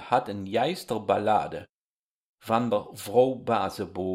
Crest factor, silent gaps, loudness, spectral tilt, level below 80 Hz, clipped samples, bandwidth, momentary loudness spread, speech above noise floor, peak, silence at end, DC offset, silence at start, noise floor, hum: 20 dB; 1.69-2.38 s; -27 LUFS; -5.5 dB/octave; -64 dBFS; under 0.1%; 16 kHz; 9 LU; over 64 dB; -8 dBFS; 0 s; under 0.1%; 0 s; under -90 dBFS; none